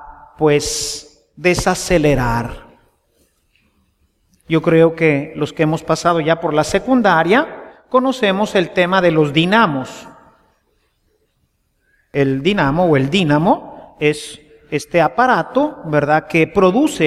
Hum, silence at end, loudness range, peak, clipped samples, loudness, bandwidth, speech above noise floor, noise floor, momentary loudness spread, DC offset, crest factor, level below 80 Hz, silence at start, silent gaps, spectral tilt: none; 0 s; 5 LU; 0 dBFS; under 0.1%; -15 LUFS; 15 kHz; 49 dB; -64 dBFS; 11 LU; under 0.1%; 16 dB; -40 dBFS; 0 s; none; -5.5 dB/octave